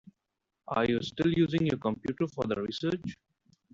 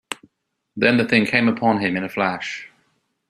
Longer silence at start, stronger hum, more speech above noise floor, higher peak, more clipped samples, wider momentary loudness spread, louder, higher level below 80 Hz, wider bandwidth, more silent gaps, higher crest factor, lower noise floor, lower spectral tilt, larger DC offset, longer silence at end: first, 0.7 s vs 0.1 s; neither; about the same, 55 dB vs 52 dB; second, -14 dBFS vs -2 dBFS; neither; second, 7 LU vs 17 LU; second, -30 LUFS vs -19 LUFS; about the same, -60 dBFS vs -62 dBFS; second, 7.6 kHz vs 13 kHz; neither; about the same, 18 dB vs 20 dB; first, -85 dBFS vs -72 dBFS; first, -7 dB/octave vs -5.5 dB/octave; neither; about the same, 0.6 s vs 0.65 s